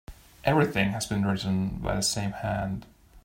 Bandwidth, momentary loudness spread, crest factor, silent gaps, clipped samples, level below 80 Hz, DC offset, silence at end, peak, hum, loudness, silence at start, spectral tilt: 16 kHz; 7 LU; 20 dB; none; under 0.1%; -46 dBFS; under 0.1%; 0.05 s; -8 dBFS; none; -27 LUFS; 0.1 s; -5 dB/octave